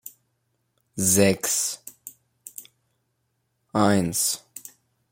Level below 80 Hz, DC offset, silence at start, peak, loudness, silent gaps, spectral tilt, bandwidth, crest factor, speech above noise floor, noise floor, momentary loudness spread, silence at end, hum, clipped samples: -62 dBFS; under 0.1%; 0.05 s; -4 dBFS; -22 LUFS; none; -3.5 dB/octave; 16.5 kHz; 22 dB; 52 dB; -74 dBFS; 24 LU; 0.55 s; none; under 0.1%